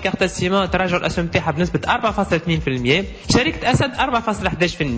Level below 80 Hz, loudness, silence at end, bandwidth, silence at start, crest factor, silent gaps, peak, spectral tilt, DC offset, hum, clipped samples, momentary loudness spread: -36 dBFS; -19 LUFS; 0 s; 8 kHz; 0 s; 16 dB; none; -2 dBFS; -5 dB/octave; under 0.1%; none; under 0.1%; 3 LU